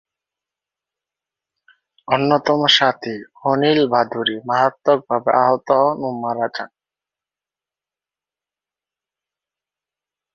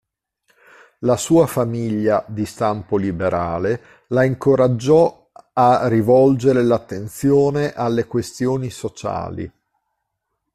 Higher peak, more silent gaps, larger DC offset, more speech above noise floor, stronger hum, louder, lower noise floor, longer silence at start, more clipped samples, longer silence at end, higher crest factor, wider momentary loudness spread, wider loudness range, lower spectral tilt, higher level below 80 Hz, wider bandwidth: about the same, 0 dBFS vs -2 dBFS; neither; neither; first, 73 dB vs 59 dB; neither; about the same, -17 LUFS vs -18 LUFS; first, -90 dBFS vs -76 dBFS; first, 2.1 s vs 1 s; neither; first, 3.7 s vs 1.05 s; about the same, 20 dB vs 16 dB; about the same, 11 LU vs 12 LU; first, 8 LU vs 5 LU; second, -5 dB/octave vs -7 dB/octave; second, -66 dBFS vs -52 dBFS; second, 7.6 kHz vs 14 kHz